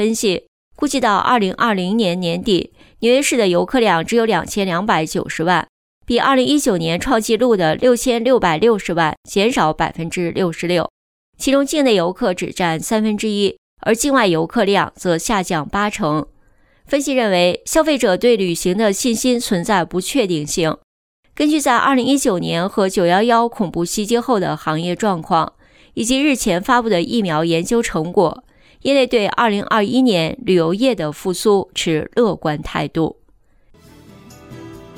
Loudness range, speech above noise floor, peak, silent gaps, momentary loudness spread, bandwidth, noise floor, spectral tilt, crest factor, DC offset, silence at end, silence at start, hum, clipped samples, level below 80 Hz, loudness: 3 LU; 36 dB; -2 dBFS; 0.48-0.71 s, 5.69-6.01 s, 9.17-9.23 s, 10.90-11.33 s, 13.58-13.77 s, 20.84-21.23 s; 7 LU; 18.5 kHz; -53 dBFS; -4.5 dB/octave; 14 dB; under 0.1%; 0 s; 0 s; none; under 0.1%; -44 dBFS; -17 LUFS